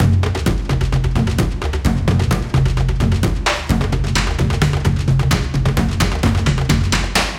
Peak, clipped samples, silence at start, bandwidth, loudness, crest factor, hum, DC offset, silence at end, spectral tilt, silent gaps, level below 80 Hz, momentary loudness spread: -2 dBFS; under 0.1%; 0 s; 17 kHz; -17 LUFS; 14 dB; none; under 0.1%; 0 s; -5.5 dB/octave; none; -22 dBFS; 2 LU